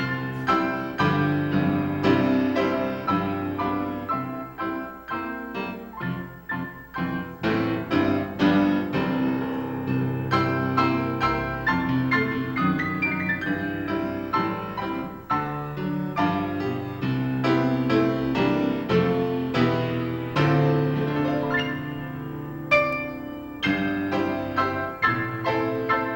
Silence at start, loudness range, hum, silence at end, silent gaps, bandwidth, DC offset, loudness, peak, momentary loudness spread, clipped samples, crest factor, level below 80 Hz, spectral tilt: 0 s; 5 LU; none; 0 s; none; 16.5 kHz; under 0.1%; -25 LUFS; -6 dBFS; 10 LU; under 0.1%; 18 dB; -52 dBFS; -7.5 dB/octave